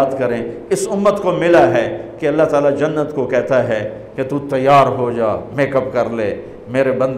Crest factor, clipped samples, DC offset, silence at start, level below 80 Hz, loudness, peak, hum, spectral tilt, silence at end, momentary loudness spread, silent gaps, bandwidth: 12 dB; under 0.1%; under 0.1%; 0 s; -48 dBFS; -16 LUFS; -2 dBFS; none; -6 dB/octave; 0 s; 11 LU; none; 13.5 kHz